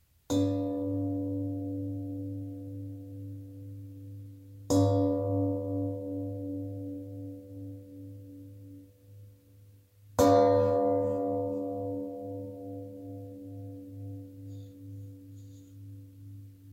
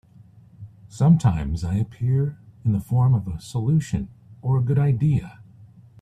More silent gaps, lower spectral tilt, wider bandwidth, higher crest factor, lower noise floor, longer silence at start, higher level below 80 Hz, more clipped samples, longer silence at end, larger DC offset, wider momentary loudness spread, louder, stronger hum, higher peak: neither; about the same, -7.5 dB/octave vs -8.5 dB/octave; first, 16 kHz vs 10 kHz; first, 22 dB vs 16 dB; first, -57 dBFS vs -50 dBFS; second, 0.3 s vs 0.6 s; second, -62 dBFS vs -42 dBFS; neither; second, 0 s vs 0.35 s; neither; first, 22 LU vs 11 LU; second, -31 LUFS vs -22 LUFS; neither; second, -12 dBFS vs -6 dBFS